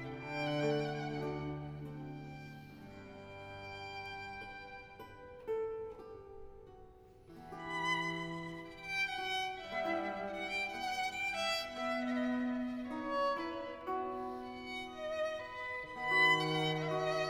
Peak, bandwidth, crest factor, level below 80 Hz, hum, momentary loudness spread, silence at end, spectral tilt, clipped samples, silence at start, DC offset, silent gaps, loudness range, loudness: -20 dBFS; 17.5 kHz; 20 dB; -64 dBFS; none; 17 LU; 0 s; -4.5 dB/octave; under 0.1%; 0 s; under 0.1%; none; 11 LU; -37 LUFS